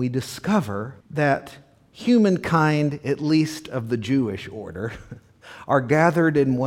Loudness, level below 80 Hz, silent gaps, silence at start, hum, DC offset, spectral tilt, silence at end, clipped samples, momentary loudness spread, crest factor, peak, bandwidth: -22 LUFS; -56 dBFS; none; 0 s; none; under 0.1%; -7 dB/octave; 0 s; under 0.1%; 14 LU; 18 dB; -4 dBFS; 16 kHz